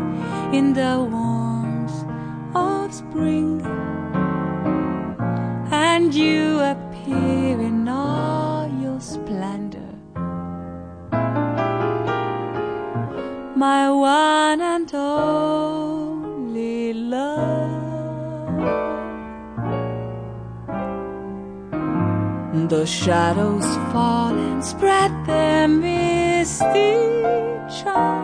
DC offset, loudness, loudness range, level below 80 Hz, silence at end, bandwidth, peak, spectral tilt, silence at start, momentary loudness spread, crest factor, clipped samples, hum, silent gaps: under 0.1%; -21 LUFS; 8 LU; -48 dBFS; 0 s; 10.5 kHz; -6 dBFS; -5.5 dB/octave; 0 s; 12 LU; 16 dB; under 0.1%; none; none